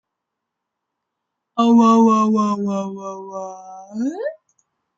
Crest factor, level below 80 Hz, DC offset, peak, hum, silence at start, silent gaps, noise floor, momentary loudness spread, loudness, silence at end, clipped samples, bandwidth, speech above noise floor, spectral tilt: 16 dB; -70 dBFS; under 0.1%; -4 dBFS; none; 1.55 s; none; -80 dBFS; 19 LU; -17 LUFS; 0.65 s; under 0.1%; 7.6 kHz; 64 dB; -6.5 dB/octave